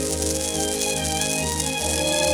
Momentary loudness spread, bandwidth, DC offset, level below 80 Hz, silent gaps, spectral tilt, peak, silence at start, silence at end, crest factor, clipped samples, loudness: 2 LU; over 20 kHz; under 0.1%; -38 dBFS; none; -2.5 dB/octave; -2 dBFS; 0 s; 0 s; 22 dB; under 0.1%; -22 LUFS